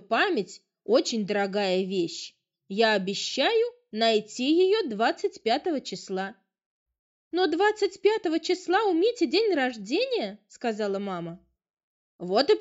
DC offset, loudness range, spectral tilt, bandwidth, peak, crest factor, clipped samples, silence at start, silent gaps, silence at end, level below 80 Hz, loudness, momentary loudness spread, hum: under 0.1%; 3 LU; -4 dB/octave; 8.2 kHz; -8 dBFS; 18 dB; under 0.1%; 0.1 s; 6.66-6.86 s, 6.99-7.31 s, 11.70-11.74 s, 11.83-12.19 s; 0 s; -74 dBFS; -26 LUFS; 10 LU; none